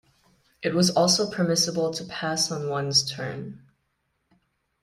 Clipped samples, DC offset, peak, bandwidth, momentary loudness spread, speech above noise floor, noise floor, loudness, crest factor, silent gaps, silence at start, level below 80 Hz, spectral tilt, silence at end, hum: under 0.1%; under 0.1%; -8 dBFS; 15.5 kHz; 12 LU; 50 dB; -75 dBFS; -24 LUFS; 20 dB; none; 0.6 s; -64 dBFS; -3.5 dB/octave; 1.25 s; none